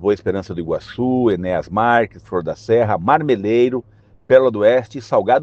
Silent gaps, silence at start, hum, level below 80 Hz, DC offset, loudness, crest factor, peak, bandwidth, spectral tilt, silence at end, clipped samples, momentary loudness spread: none; 0 s; none; -50 dBFS; under 0.1%; -17 LUFS; 16 dB; 0 dBFS; 7.4 kHz; -7.5 dB/octave; 0 s; under 0.1%; 10 LU